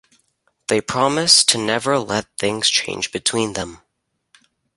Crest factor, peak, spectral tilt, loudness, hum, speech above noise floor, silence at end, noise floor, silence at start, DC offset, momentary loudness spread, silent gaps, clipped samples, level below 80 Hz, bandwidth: 20 dB; 0 dBFS; -2 dB/octave; -17 LUFS; none; 55 dB; 1 s; -74 dBFS; 0.7 s; under 0.1%; 13 LU; none; under 0.1%; -54 dBFS; 12 kHz